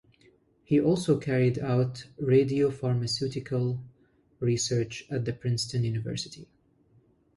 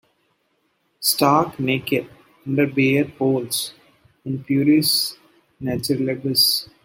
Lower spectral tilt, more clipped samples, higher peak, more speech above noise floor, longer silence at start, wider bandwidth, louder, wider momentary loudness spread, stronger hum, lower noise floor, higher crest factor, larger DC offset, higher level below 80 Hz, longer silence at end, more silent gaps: first, -6 dB/octave vs -4 dB/octave; neither; second, -10 dBFS vs -2 dBFS; second, 37 dB vs 48 dB; second, 0.7 s vs 1 s; second, 11.5 kHz vs 16.5 kHz; second, -28 LUFS vs -20 LUFS; second, 9 LU vs 13 LU; neither; second, -64 dBFS vs -68 dBFS; about the same, 18 dB vs 18 dB; neither; about the same, -60 dBFS vs -62 dBFS; first, 0.95 s vs 0.2 s; neither